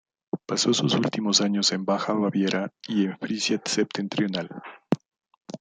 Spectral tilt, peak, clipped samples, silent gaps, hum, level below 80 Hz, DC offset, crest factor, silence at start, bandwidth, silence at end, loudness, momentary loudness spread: -4 dB/octave; -6 dBFS; under 0.1%; 5.37-5.41 s; none; -70 dBFS; under 0.1%; 20 dB; 0.35 s; 9.6 kHz; 0.05 s; -25 LUFS; 10 LU